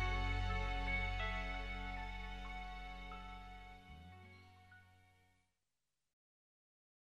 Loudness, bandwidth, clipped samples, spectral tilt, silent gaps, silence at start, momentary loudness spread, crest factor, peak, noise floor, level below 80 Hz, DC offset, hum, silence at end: -44 LUFS; 8.4 kHz; under 0.1%; -5 dB/octave; none; 0 s; 21 LU; 18 dB; -26 dBFS; under -90 dBFS; -48 dBFS; under 0.1%; none; 1.8 s